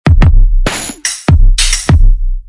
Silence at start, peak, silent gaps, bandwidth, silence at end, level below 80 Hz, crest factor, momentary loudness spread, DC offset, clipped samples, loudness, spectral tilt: 0.05 s; 0 dBFS; none; 11.5 kHz; 0.05 s; -8 dBFS; 8 dB; 7 LU; under 0.1%; 0.2%; -11 LUFS; -4 dB/octave